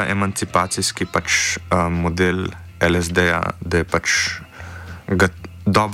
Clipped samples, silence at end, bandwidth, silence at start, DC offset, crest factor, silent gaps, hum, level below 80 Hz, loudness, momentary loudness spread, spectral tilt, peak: under 0.1%; 0 s; 16 kHz; 0 s; under 0.1%; 16 dB; none; none; -40 dBFS; -19 LUFS; 10 LU; -4 dB/octave; -4 dBFS